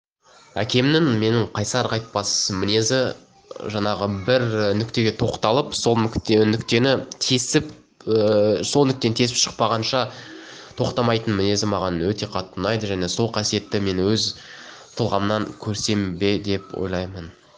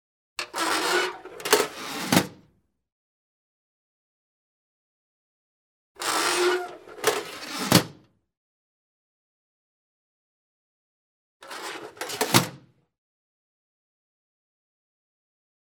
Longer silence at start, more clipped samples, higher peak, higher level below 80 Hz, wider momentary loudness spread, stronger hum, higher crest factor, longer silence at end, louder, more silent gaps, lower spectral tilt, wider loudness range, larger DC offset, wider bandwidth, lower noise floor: first, 0.55 s vs 0.4 s; neither; about the same, -2 dBFS vs 0 dBFS; first, -50 dBFS vs -66 dBFS; second, 10 LU vs 15 LU; neither; second, 20 dB vs 30 dB; second, 0.25 s vs 3.05 s; first, -21 LUFS vs -25 LUFS; second, none vs 2.92-5.95 s, 8.37-11.40 s; first, -4.5 dB/octave vs -3 dB/octave; second, 4 LU vs 10 LU; neither; second, 10.5 kHz vs 19.5 kHz; second, -52 dBFS vs -65 dBFS